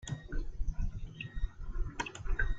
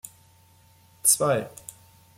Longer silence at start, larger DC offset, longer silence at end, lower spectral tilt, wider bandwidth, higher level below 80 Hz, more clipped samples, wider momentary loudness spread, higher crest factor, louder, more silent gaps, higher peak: second, 0 s vs 1.05 s; neither; second, 0 s vs 0.7 s; first, -4.5 dB/octave vs -2.5 dB/octave; second, 7.8 kHz vs 16.5 kHz; first, -36 dBFS vs -68 dBFS; neither; second, 6 LU vs 24 LU; second, 16 dB vs 24 dB; second, -42 LUFS vs -22 LUFS; neither; second, -20 dBFS vs -4 dBFS